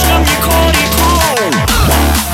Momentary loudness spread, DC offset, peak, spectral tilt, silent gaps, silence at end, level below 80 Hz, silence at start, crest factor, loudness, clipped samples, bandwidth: 2 LU; under 0.1%; 0 dBFS; -3.5 dB/octave; none; 0 s; -16 dBFS; 0 s; 10 dB; -10 LUFS; under 0.1%; 17 kHz